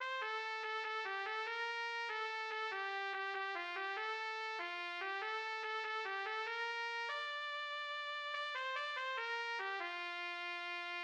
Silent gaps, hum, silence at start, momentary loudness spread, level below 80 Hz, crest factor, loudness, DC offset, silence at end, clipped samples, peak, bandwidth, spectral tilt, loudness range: none; none; 0 s; 2 LU; under -90 dBFS; 16 dB; -41 LUFS; under 0.1%; 0 s; under 0.1%; -28 dBFS; 10.5 kHz; 0.5 dB/octave; 1 LU